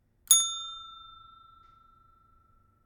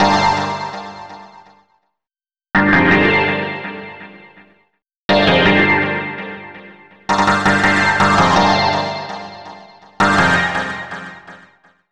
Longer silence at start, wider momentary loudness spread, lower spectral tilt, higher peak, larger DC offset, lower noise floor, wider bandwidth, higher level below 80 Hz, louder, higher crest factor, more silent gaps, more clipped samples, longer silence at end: first, 0.3 s vs 0 s; first, 25 LU vs 21 LU; second, 3.5 dB/octave vs -5 dB/octave; about the same, -6 dBFS vs -4 dBFS; neither; second, -64 dBFS vs under -90 dBFS; first, 18 kHz vs 11.5 kHz; second, -68 dBFS vs -44 dBFS; second, -23 LUFS vs -14 LUFS; first, 28 dB vs 14 dB; second, none vs 4.96-5.09 s; neither; first, 1.9 s vs 0.55 s